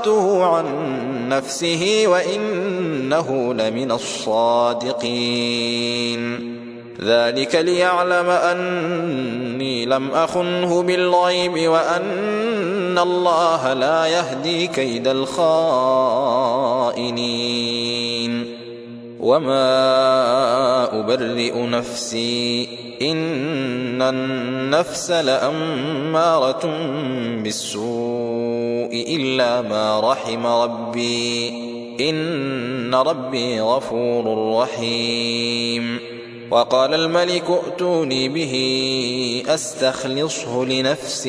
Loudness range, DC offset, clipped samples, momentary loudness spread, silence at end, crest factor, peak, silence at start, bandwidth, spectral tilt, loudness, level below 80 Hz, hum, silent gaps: 3 LU; under 0.1%; under 0.1%; 7 LU; 0 s; 16 dB; -4 dBFS; 0 s; 11 kHz; -4 dB/octave; -19 LUFS; -62 dBFS; none; none